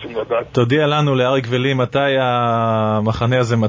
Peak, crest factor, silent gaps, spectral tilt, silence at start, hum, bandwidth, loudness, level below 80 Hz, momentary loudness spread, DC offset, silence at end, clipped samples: -2 dBFS; 14 dB; none; -7 dB/octave; 0 s; none; 7.6 kHz; -17 LUFS; -46 dBFS; 3 LU; under 0.1%; 0 s; under 0.1%